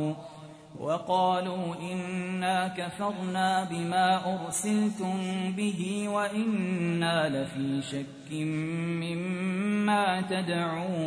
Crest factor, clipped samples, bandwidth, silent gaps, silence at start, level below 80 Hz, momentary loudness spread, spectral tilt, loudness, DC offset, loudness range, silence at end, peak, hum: 16 dB; under 0.1%; 11 kHz; none; 0 s; -70 dBFS; 8 LU; -5 dB/octave; -29 LUFS; under 0.1%; 2 LU; 0 s; -14 dBFS; none